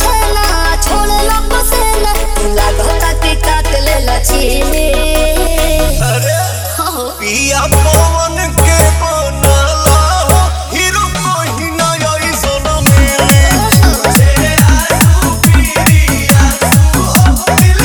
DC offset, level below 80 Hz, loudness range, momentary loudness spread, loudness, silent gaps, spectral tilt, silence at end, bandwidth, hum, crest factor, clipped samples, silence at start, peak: under 0.1%; -14 dBFS; 4 LU; 5 LU; -10 LUFS; none; -4 dB/octave; 0 s; over 20 kHz; none; 8 dB; 0.5%; 0 s; 0 dBFS